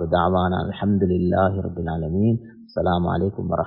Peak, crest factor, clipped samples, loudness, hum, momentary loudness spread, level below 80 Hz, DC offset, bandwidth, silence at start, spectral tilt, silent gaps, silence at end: -6 dBFS; 16 dB; under 0.1%; -22 LUFS; none; 7 LU; -36 dBFS; under 0.1%; 5.4 kHz; 0 s; -12.5 dB/octave; none; 0 s